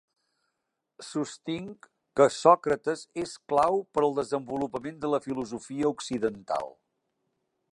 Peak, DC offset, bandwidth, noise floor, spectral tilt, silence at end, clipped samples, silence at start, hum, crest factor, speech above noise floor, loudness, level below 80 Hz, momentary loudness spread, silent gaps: -4 dBFS; under 0.1%; 11.5 kHz; -83 dBFS; -5 dB/octave; 1 s; under 0.1%; 1 s; none; 24 dB; 55 dB; -28 LUFS; -66 dBFS; 14 LU; none